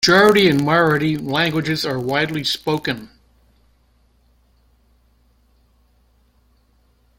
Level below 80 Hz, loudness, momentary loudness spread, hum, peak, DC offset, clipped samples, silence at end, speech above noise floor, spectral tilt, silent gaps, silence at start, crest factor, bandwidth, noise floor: -52 dBFS; -17 LUFS; 10 LU; none; -2 dBFS; under 0.1%; under 0.1%; 4.15 s; 42 dB; -5 dB/octave; none; 0 s; 20 dB; 16.5 kHz; -58 dBFS